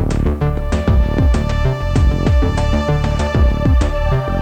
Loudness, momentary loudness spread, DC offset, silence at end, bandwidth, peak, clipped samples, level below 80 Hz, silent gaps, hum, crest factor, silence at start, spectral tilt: -16 LUFS; 3 LU; under 0.1%; 0 s; 9.2 kHz; -2 dBFS; under 0.1%; -16 dBFS; none; none; 12 dB; 0 s; -7.5 dB/octave